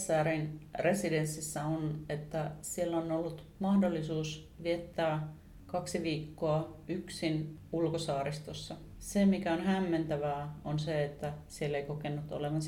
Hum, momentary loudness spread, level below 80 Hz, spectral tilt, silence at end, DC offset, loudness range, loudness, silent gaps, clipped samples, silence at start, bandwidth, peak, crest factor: none; 10 LU; -58 dBFS; -6 dB/octave; 0 s; under 0.1%; 3 LU; -35 LUFS; none; under 0.1%; 0 s; 16.5 kHz; -18 dBFS; 16 dB